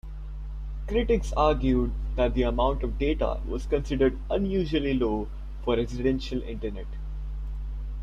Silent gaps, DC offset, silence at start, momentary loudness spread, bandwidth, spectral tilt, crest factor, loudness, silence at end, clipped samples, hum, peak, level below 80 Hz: none; under 0.1%; 0.05 s; 13 LU; 7.6 kHz; -7.5 dB/octave; 16 dB; -28 LUFS; 0 s; under 0.1%; none; -10 dBFS; -32 dBFS